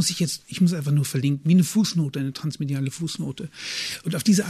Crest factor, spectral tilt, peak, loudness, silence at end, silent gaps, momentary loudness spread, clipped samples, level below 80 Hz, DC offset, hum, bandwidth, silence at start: 14 dB; -5 dB/octave; -8 dBFS; -24 LUFS; 0 s; none; 10 LU; under 0.1%; -64 dBFS; under 0.1%; none; 14 kHz; 0 s